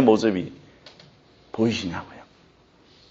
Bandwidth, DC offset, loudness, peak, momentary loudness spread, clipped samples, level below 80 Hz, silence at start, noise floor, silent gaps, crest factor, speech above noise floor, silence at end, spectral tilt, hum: 8 kHz; under 0.1%; -25 LUFS; -2 dBFS; 27 LU; under 0.1%; -62 dBFS; 0 s; -56 dBFS; none; 24 dB; 34 dB; 0.9 s; -5 dB/octave; none